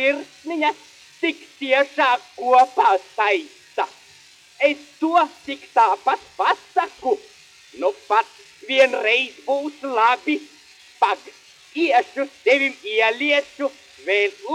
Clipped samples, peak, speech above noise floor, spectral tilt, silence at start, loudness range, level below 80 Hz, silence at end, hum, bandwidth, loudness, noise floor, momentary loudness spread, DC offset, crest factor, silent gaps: under 0.1%; -2 dBFS; 29 dB; -1.5 dB/octave; 0 s; 2 LU; -74 dBFS; 0 s; none; 12 kHz; -20 LUFS; -49 dBFS; 11 LU; under 0.1%; 20 dB; none